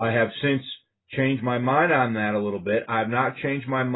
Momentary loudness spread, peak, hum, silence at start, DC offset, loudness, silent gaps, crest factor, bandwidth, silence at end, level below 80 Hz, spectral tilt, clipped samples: 8 LU; -8 dBFS; none; 0 s; under 0.1%; -24 LUFS; none; 16 dB; 4.1 kHz; 0 s; -60 dBFS; -11 dB/octave; under 0.1%